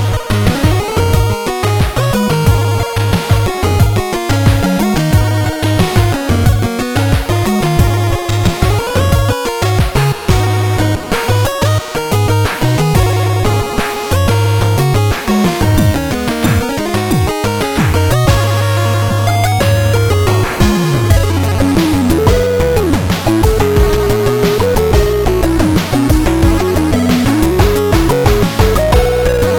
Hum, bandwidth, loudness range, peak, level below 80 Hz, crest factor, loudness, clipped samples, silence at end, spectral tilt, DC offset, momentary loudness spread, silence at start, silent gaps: none; 18 kHz; 2 LU; 0 dBFS; -20 dBFS; 12 dB; -12 LUFS; under 0.1%; 0 s; -6 dB/octave; under 0.1%; 3 LU; 0 s; none